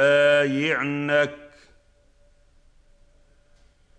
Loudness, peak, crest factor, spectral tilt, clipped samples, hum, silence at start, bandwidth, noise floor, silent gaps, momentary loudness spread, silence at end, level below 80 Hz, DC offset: -21 LUFS; -8 dBFS; 18 dB; -5.5 dB/octave; under 0.1%; none; 0 s; 8.8 kHz; -58 dBFS; none; 9 LU; 2.5 s; -60 dBFS; under 0.1%